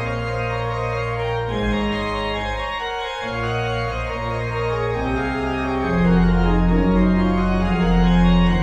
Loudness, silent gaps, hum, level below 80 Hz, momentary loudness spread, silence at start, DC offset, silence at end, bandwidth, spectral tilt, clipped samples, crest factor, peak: -21 LUFS; none; none; -26 dBFS; 8 LU; 0 s; under 0.1%; 0 s; 8 kHz; -7.5 dB/octave; under 0.1%; 14 dB; -6 dBFS